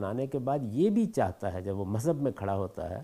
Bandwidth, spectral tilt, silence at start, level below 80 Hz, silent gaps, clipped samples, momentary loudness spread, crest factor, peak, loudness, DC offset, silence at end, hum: 15.5 kHz; -8 dB/octave; 0 s; -62 dBFS; none; under 0.1%; 8 LU; 16 dB; -14 dBFS; -31 LUFS; under 0.1%; 0 s; none